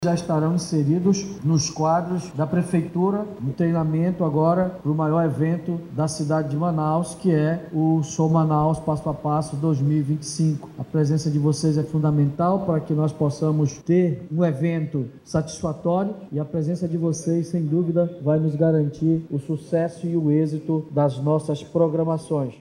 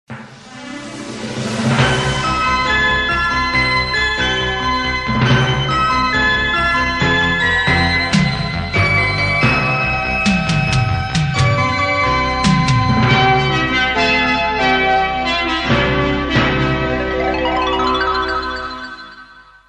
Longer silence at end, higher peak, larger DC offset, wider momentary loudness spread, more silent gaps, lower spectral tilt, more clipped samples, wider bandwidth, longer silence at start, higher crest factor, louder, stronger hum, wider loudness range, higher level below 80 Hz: second, 0.05 s vs 0.3 s; second, -6 dBFS vs 0 dBFS; neither; about the same, 6 LU vs 7 LU; neither; first, -7.5 dB/octave vs -5 dB/octave; neither; about the same, 10.5 kHz vs 11 kHz; about the same, 0 s vs 0.1 s; about the same, 16 dB vs 16 dB; second, -23 LUFS vs -15 LUFS; neither; about the same, 2 LU vs 2 LU; second, -54 dBFS vs -30 dBFS